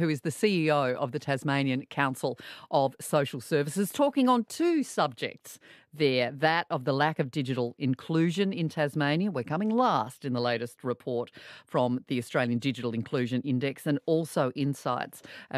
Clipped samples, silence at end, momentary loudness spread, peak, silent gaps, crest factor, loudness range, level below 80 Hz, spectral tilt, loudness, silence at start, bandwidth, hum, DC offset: under 0.1%; 0 s; 8 LU; -10 dBFS; none; 18 dB; 3 LU; -76 dBFS; -6 dB/octave; -29 LUFS; 0 s; 14.5 kHz; none; under 0.1%